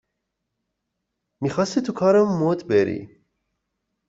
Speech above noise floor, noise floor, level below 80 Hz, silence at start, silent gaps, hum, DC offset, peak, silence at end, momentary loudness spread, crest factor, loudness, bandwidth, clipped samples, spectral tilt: 59 dB; -79 dBFS; -62 dBFS; 1.4 s; none; none; under 0.1%; -6 dBFS; 1.05 s; 10 LU; 18 dB; -21 LUFS; 7.8 kHz; under 0.1%; -6.5 dB/octave